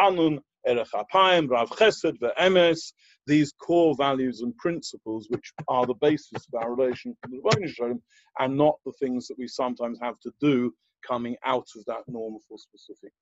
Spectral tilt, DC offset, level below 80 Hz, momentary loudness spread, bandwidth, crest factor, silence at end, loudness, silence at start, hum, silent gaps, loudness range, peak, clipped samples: -5.5 dB/octave; under 0.1%; -66 dBFS; 14 LU; 8.2 kHz; 20 dB; 0.15 s; -25 LUFS; 0 s; none; none; 7 LU; -6 dBFS; under 0.1%